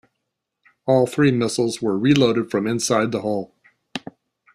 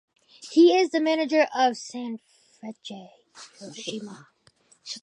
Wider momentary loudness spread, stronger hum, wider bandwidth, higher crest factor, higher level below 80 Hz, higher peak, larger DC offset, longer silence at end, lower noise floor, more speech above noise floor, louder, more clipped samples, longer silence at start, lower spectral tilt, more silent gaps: second, 17 LU vs 25 LU; neither; first, 14 kHz vs 10 kHz; about the same, 20 dB vs 18 dB; first, -58 dBFS vs -84 dBFS; first, -2 dBFS vs -8 dBFS; neither; first, 0.55 s vs 0.05 s; first, -79 dBFS vs -61 dBFS; first, 60 dB vs 37 dB; first, -20 LUFS vs -23 LUFS; neither; first, 0.85 s vs 0.4 s; first, -5.5 dB/octave vs -3.5 dB/octave; neither